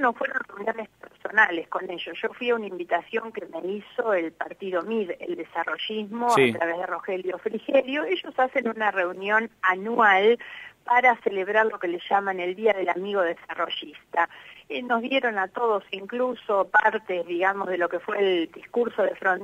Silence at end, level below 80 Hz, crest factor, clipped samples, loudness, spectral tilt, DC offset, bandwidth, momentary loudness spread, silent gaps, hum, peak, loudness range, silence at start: 0 s; -72 dBFS; 20 dB; under 0.1%; -25 LUFS; -4.5 dB/octave; under 0.1%; 14.5 kHz; 11 LU; none; none; -6 dBFS; 6 LU; 0 s